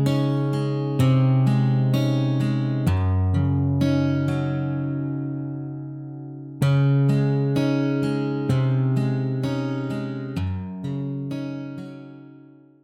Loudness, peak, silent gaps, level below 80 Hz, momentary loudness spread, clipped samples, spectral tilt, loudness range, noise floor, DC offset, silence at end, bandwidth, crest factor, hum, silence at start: -23 LUFS; -8 dBFS; none; -52 dBFS; 14 LU; under 0.1%; -8.5 dB/octave; 6 LU; -48 dBFS; under 0.1%; 0.45 s; 10.5 kHz; 14 dB; none; 0 s